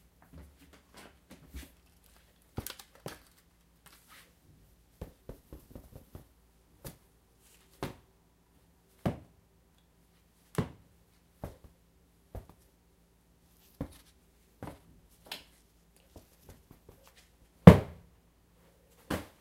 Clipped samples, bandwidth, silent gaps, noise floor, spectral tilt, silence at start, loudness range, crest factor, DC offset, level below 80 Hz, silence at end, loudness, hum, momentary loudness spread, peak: under 0.1%; 16 kHz; none; -66 dBFS; -8 dB/octave; 1.55 s; 26 LU; 34 dB; under 0.1%; -50 dBFS; 0.2 s; -27 LUFS; none; 27 LU; 0 dBFS